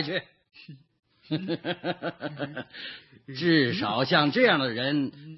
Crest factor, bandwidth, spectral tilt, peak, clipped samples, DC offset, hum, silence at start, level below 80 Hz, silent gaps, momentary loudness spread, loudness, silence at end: 22 dB; 6 kHz; -7.5 dB/octave; -6 dBFS; under 0.1%; under 0.1%; none; 0 s; -72 dBFS; none; 17 LU; -26 LUFS; 0 s